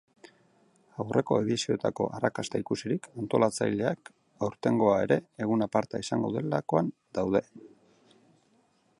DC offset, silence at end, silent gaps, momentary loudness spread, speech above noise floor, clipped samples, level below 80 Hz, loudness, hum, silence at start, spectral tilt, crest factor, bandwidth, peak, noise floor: under 0.1%; 1.3 s; none; 8 LU; 39 dB; under 0.1%; -64 dBFS; -29 LUFS; none; 1 s; -6 dB/octave; 20 dB; 11.5 kHz; -10 dBFS; -68 dBFS